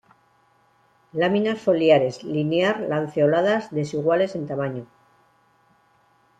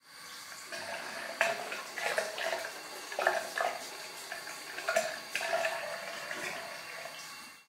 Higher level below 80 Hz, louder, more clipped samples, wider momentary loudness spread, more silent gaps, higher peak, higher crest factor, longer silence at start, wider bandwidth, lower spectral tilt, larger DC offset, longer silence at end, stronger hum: first, -66 dBFS vs -86 dBFS; first, -22 LUFS vs -36 LUFS; neither; about the same, 10 LU vs 11 LU; neither; first, -4 dBFS vs -10 dBFS; second, 18 dB vs 26 dB; first, 1.15 s vs 0.05 s; second, 9.2 kHz vs 16 kHz; first, -6.5 dB/octave vs -0.5 dB/octave; neither; first, 1.55 s vs 0.05 s; neither